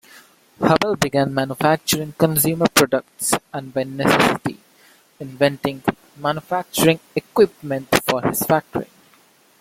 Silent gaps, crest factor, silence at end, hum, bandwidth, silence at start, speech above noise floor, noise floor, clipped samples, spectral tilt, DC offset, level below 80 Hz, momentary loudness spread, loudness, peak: none; 20 dB; 0.75 s; none; 16.5 kHz; 0.6 s; 35 dB; -54 dBFS; under 0.1%; -4 dB/octave; under 0.1%; -52 dBFS; 10 LU; -19 LUFS; 0 dBFS